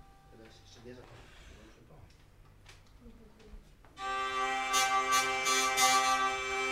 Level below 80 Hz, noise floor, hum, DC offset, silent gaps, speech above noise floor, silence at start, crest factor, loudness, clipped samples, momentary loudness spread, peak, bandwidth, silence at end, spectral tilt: -60 dBFS; -58 dBFS; none; under 0.1%; none; 7 dB; 0.35 s; 20 dB; -29 LUFS; under 0.1%; 26 LU; -14 dBFS; 16 kHz; 0 s; 0 dB/octave